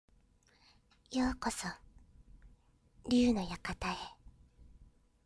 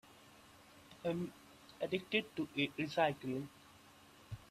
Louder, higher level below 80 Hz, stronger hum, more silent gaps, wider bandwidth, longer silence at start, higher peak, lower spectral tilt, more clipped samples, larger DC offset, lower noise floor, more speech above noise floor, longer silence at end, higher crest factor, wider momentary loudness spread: first, -35 LUFS vs -39 LUFS; first, -54 dBFS vs -72 dBFS; neither; neither; second, 11 kHz vs 14.5 kHz; first, 1.1 s vs 0.15 s; about the same, -20 dBFS vs -20 dBFS; about the same, -4.5 dB/octave vs -5.5 dB/octave; neither; neither; first, -68 dBFS vs -62 dBFS; first, 34 dB vs 24 dB; first, 0.4 s vs 0.05 s; about the same, 18 dB vs 22 dB; second, 18 LU vs 25 LU